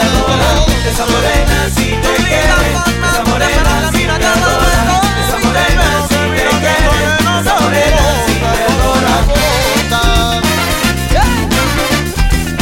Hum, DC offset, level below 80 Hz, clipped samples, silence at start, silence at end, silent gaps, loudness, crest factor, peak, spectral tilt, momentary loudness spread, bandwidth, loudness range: none; under 0.1%; -16 dBFS; under 0.1%; 0 s; 0 s; none; -11 LUFS; 10 dB; 0 dBFS; -4 dB/octave; 2 LU; 17 kHz; 1 LU